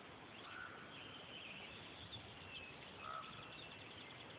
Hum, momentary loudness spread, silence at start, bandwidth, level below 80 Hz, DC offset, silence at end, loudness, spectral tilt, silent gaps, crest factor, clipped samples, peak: none; 3 LU; 0 s; 4 kHz; -74 dBFS; under 0.1%; 0 s; -52 LUFS; -1.5 dB/octave; none; 16 dB; under 0.1%; -38 dBFS